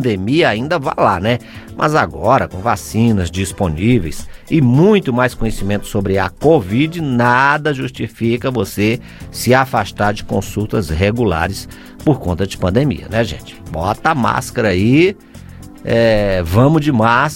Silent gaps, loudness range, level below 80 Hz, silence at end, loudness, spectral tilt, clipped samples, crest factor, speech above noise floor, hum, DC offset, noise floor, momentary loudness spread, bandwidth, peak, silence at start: none; 3 LU; -34 dBFS; 0 s; -15 LUFS; -6.5 dB/octave; under 0.1%; 14 dB; 20 dB; none; under 0.1%; -34 dBFS; 9 LU; 16.5 kHz; 0 dBFS; 0 s